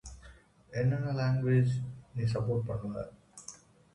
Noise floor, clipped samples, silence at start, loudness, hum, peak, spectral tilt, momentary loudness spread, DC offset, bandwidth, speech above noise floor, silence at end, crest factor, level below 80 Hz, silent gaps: -56 dBFS; under 0.1%; 0.05 s; -32 LUFS; none; -18 dBFS; -7.5 dB/octave; 20 LU; under 0.1%; 10.5 kHz; 26 dB; 0.4 s; 14 dB; -56 dBFS; none